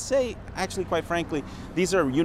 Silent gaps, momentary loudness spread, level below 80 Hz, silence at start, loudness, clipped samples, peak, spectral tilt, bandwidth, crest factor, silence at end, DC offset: none; 9 LU; -44 dBFS; 0 s; -27 LUFS; under 0.1%; -10 dBFS; -5 dB/octave; 15.5 kHz; 16 dB; 0 s; under 0.1%